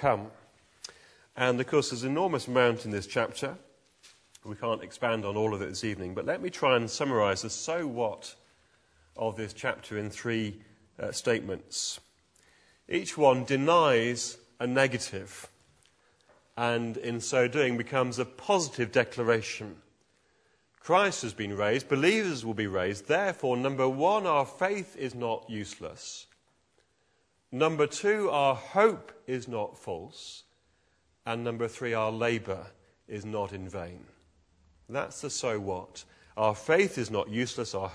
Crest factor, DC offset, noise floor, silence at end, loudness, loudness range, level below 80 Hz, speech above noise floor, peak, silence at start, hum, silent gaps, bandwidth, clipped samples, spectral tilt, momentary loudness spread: 22 dB; under 0.1%; -72 dBFS; 0 s; -29 LUFS; 7 LU; -68 dBFS; 42 dB; -8 dBFS; 0 s; none; none; 11 kHz; under 0.1%; -4.5 dB/octave; 16 LU